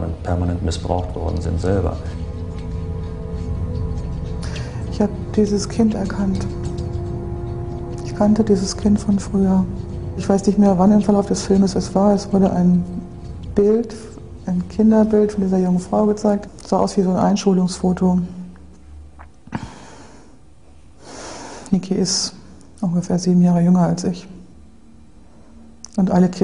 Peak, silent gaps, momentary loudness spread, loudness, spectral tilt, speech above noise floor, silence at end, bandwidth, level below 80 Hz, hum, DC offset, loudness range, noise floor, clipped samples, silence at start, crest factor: 0 dBFS; none; 15 LU; -19 LUFS; -7 dB/octave; 30 dB; 0 s; 11 kHz; -34 dBFS; none; 0.6%; 8 LU; -47 dBFS; under 0.1%; 0 s; 18 dB